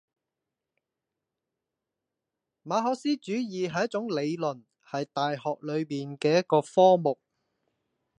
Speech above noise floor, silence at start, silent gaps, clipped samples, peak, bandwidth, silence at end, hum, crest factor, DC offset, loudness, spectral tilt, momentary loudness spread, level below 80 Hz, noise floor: 61 dB; 2.65 s; none; under 0.1%; -8 dBFS; 10 kHz; 1.05 s; none; 20 dB; under 0.1%; -27 LUFS; -6 dB/octave; 13 LU; -78 dBFS; -87 dBFS